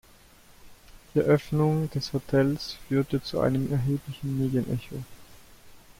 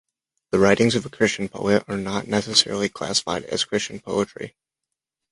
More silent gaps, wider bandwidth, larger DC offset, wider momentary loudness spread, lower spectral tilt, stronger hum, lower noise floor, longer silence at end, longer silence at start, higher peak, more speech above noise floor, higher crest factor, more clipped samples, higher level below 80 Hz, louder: neither; first, 16.5 kHz vs 11.5 kHz; neither; about the same, 10 LU vs 9 LU; first, -7.5 dB/octave vs -3.5 dB/octave; neither; second, -54 dBFS vs -84 dBFS; second, 0.2 s vs 0.85 s; about the same, 0.65 s vs 0.55 s; second, -10 dBFS vs -2 dBFS; second, 28 dB vs 62 dB; about the same, 18 dB vs 22 dB; neither; about the same, -52 dBFS vs -54 dBFS; second, -27 LUFS vs -22 LUFS